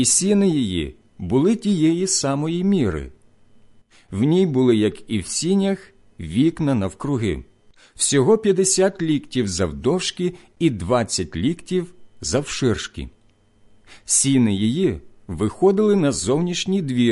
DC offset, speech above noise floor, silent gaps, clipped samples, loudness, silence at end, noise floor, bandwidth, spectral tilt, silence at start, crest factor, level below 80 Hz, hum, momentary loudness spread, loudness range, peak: under 0.1%; 36 dB; none; under 0.1%; -20 LUFS; 0 s; -56 dBFS; 11.5 kHz; -4.5 dB/octave; 0 s; 16 dB; -42 dBFS; none; 13 LU; 4 LU; -4 dBFS